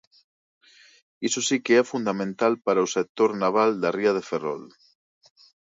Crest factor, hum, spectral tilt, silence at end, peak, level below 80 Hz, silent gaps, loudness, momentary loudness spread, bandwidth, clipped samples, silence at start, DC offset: 18 dB; none; -4 dB/octave; 1.1 s; -8 dBFS; -74 dBFS; 3.09-3.15 s; -24 LUFS; 9 LU; 8 kHz; under 0.1%; 1.2 s; under 0.1%